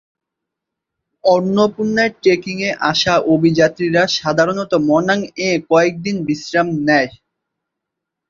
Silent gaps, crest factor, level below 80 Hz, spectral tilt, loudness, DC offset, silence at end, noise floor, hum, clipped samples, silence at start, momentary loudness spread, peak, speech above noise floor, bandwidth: none; 16 dB; -54 dBFS; -5 dB/octave; -16 LUFS; under 0.1%; 1.2 s; -81 dBFS; none; under 0.1%; 1.25 s; 5 LU; 0 dBFS; 66 dB; 7.6 kHz